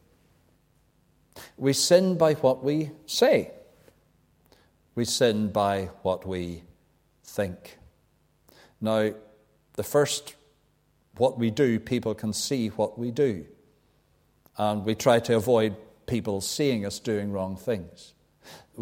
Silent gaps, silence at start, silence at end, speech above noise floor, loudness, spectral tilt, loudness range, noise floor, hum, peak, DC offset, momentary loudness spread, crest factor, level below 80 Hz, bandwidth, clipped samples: none; 1.35 s; 0 s; 41 dB; -26 LUFS; -4.5 dB/octave; 7 LU; -66 dBFS; none; -6 dBFS; under 0.1%; 16 LU; 22 dB; -60 dBFS; 16.5 kHz; under 0.1%